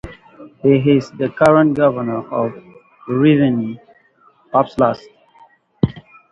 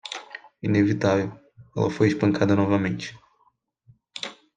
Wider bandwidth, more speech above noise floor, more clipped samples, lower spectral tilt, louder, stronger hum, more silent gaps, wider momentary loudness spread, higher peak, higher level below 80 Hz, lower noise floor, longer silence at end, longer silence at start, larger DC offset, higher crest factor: first, 10.5 kHz vs 9.2 kHz; second, 39 dB vs 45 dB; neither; first, -8.5 dB/octave vs -7 dB/octave; first, -16 LUFS vs -24 LUFS; neither; neither; about the same, 14 LU vs 15 LU; first, 0 dBFS vs -6 dBFS; first, -48 dBFS vs -62 dBFS; second, -53 dBFS vs -66 dBFS; about the same, 0.3 s vs 0.25 s; about the same, 0.05 s vs 0.05 s; neither; about the same, 18 dB vs 18 dB